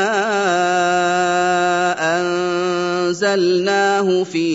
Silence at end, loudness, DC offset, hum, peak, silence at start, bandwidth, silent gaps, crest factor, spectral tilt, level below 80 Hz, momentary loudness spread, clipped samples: 0 s; -17 LUFS; under 0.1%; none; -4 dBFS; 0 s; 8 kHz; none; 12 dB; -4 dB/octave; -72 dBFS; 3 LU; under 0.1%